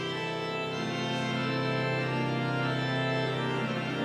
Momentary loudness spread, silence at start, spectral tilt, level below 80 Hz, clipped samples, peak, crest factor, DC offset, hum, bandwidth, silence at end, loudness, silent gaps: 3 LU; 0 s; -6 dB/octave; -66 dBFS; under 0.1%; -18 dBFS; 12 dB; under 0.1%; none; 10.5 kHz; 0 s; -30 LUFS; none